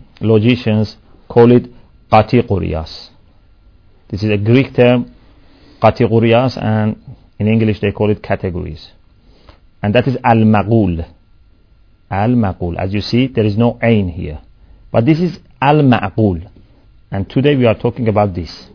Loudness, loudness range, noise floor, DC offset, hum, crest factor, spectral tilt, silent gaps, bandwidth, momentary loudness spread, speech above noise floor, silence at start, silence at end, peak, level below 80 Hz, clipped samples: -14 LUFS; 3 LU; -48 dBFS; under 0.1%; none; 14 dB; -9 dB/octave; none; 5.4 kHz; 14 LU; 35 dB; 0.2 s; 0.1 s; 0 dBFS; -38 dBFS; 0.2%